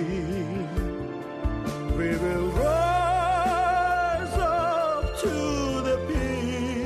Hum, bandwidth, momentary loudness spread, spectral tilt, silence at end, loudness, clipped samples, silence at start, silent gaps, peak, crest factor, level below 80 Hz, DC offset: none; 13.5 kHz; 8 LU; -6 dB/octave; 0 s; -26 LUFS; under 0.1%; 0 s; none; -12 dBFS; 14 dB; -36 dBFS; under 0.1%